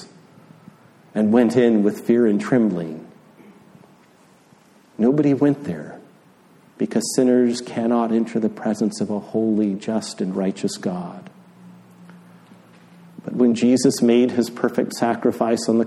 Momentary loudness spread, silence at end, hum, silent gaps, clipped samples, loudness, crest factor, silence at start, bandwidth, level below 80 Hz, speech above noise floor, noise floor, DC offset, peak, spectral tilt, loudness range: 13 LU; 0 s; none; none; under 0.1%; -20 LUFS; 18 dB; 0 s; 13.5 kHz; -68 dBFS; 34 dB; -53 dBFS; under 0.1%; -2 dBFS; -6 dB/octave; 6 LU